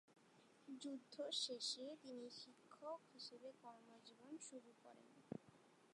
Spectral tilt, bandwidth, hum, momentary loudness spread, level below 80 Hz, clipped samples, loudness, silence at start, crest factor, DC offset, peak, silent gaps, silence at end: -2.5 dB/octave; 11 kHz; none; 20 LU; under -90 dBFS; under 0.1%; -52 LUFS; 0.1 s; 22 dB; under 0.1%; -32 dBFS; none; 0 s